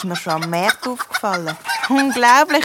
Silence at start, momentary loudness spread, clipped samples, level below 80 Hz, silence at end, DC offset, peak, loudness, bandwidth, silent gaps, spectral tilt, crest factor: 0 s; 11 LU; under 0.1%; -64 dBFS; 0 s; under 0.1%; 0 dBFS; -17 LUFS; 17.5 kHz; none; -3.5 dB/octave; 18 dB